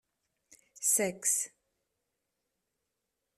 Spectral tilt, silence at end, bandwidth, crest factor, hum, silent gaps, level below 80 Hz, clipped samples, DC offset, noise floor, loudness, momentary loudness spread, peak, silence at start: -2 dB/octave; 1.9 s; 13.5 kHz; 24 dB; none; none; -82 dBFS; under 0.1%; under 0.1%; -85 dBFS; -29 LUFS; 6 LU; -14 dBFS; 0.75 s